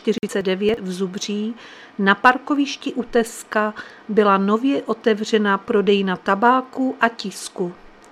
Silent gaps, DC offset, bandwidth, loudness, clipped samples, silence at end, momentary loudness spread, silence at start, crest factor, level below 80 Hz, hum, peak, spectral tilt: none; under 0.1%; 14 kHz; -20 LUFS; under 0.1%; 0.35 s; 12 LU; 0.05 s; 20 dB; -56 dBFS; none; 0 dBFS; -5 dB/octave